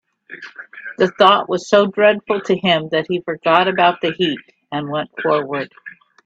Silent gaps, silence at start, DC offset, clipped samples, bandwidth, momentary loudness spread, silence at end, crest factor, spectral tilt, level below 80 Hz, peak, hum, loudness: none; 0.3 s; under 0.1%; under 0.1%; 8 kHz; 19 LU; 0.35 s; 18 dB; -5 dB/octave; -62 dBFS; 0 dBFS; none; -17 LUFS